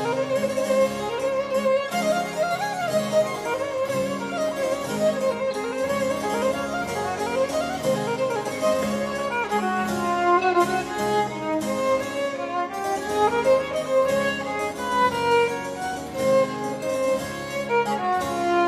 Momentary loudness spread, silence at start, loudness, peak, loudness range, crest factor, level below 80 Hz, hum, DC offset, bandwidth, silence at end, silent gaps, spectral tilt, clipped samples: 6 LU; 0 s; -24 LUFS; -8 dBFS; 2 LU; 16 dB; -54 dBFS; none; under 0.1%; 15.5 kHz; 0 s; none; -4.5 dB/octave; under 0.1%